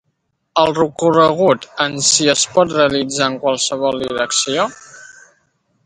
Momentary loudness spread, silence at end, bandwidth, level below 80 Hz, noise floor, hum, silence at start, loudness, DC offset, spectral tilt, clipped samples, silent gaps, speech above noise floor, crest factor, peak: 7 LU; 0.8 s; 11.5 kHz; -54 dBFS; -69 dBFS; none; 0.55 s; -15 LUFS; under 0.1%; -2.5 dB/octave; under 0.1%; none; 53 dB; 16 dB; 0 dBFS